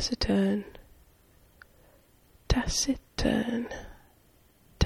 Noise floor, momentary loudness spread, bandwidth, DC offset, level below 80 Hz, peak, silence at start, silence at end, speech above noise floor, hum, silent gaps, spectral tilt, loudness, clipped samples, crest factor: -62 dBFS; 16 LU; 15.5 kHz; under 0.1%; -40 dBFS; -8 dBFS; 0 s; 0 s; 33 dB; none; none; -4.5 dB/octave; -29 LUFS; under 0.1%; 24 dB